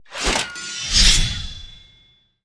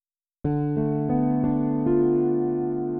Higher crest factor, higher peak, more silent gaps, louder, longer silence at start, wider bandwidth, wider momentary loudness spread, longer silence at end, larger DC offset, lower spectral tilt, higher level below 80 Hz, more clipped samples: first, 20 dB vs 12 dB; first, -2 dBFS vs -10 dBFS; neither; first, -17 LUFS vs -24 LUFS; second, 0.1 s vs 0.45 s; first, 11 kHz vs 2.7 kHz; first, 18 LU vs 5 LU; first, 0.65 s vs 0 s; neither; second, -1 dB/octave vs -14.5 dB/octave; first, -26 dBFS vs -46 dBFS; neither